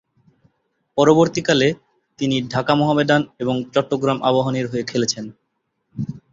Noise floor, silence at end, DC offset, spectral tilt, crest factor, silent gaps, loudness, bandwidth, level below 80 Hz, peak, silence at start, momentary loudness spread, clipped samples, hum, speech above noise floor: -73 dBFS; 0.15 s; under 0.1%; -5 dB/octave; 18 dB; none; -19 LUFS; 7.8 kHz; -56 dBFS; -2 dBFS; 0.95 s; 14 LU; under 0.1%; none; 54 dB